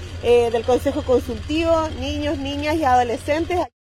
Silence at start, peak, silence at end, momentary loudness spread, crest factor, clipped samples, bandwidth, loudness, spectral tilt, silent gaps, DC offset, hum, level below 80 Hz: 0 s; -6 dBFS; 0.3 s; 7 LU; 14 dB; under 0.1%; 15 kHz; -20 LUFS; -5.5 dB/octave; none; under 0.1%; none; -38 dBFS